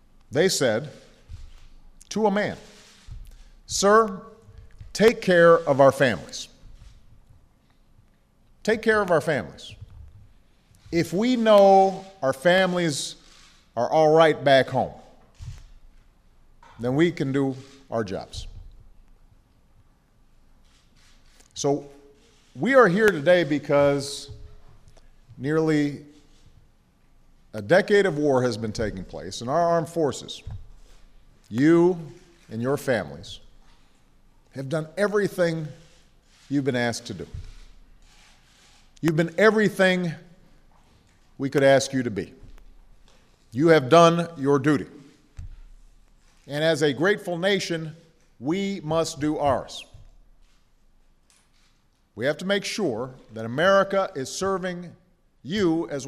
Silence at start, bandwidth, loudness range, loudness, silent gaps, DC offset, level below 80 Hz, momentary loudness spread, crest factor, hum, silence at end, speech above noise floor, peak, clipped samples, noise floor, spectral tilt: 0.3 s; 15.5 kHz; 9 LU; -22 LUFS; none; under 0.1%; -50 dBFS; 21 LU; 22 dB; none; 0 s; 41 dB; -4 dBFS; under 0.1%; -62 dBFS; -5 dB/octave